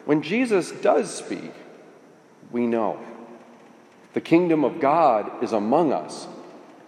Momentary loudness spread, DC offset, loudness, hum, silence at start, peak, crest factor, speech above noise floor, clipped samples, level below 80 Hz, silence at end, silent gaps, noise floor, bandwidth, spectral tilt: 18 LU; under 0.1%; -22 LUFS; none; 0.05 s; -4 dBFS; 18 dB; 29 dB; under 0.1%; -82 dBFS; 0.15 s; none; -51 dBFS; 10.5 kHz; -6 dB/octave